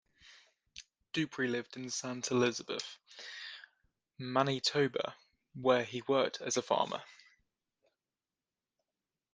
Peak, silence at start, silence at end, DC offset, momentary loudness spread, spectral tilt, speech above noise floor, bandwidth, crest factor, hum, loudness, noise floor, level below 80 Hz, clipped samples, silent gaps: -14 dBFS; 0.25 s; 2.2 s; under 0.1%; 18 LU; -3.5 dB/octave; over 56 dB; 10 kHz; 24 dB; none; -34 LUFS; under -90 dBFS; -78 dBFS; under 0.1%; none